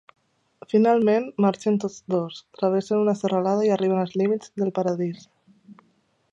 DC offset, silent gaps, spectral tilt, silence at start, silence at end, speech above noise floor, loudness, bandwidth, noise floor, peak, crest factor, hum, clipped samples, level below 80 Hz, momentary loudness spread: under 0.1%; none; -7 dB/octave; 0.7 s; 0.6 s; 43 dB; -23 LUFS; 8.2 kHz; -65 dBFS; -8 dBFS; 16 dB; none; under 0.1%; -72 dBFS; 7 LU